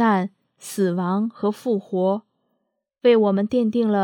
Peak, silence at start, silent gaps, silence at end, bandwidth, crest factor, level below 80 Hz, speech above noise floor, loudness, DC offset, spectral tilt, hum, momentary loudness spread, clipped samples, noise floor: -6 dBFS; 0 s; none; 0 s; 17 kHz; 16 dB; -68 dBFS; 55 dB; -21 LUFS; under 0.1%; -7 dB/octave; none; 11 LU; under 0.1%; -75 dBFS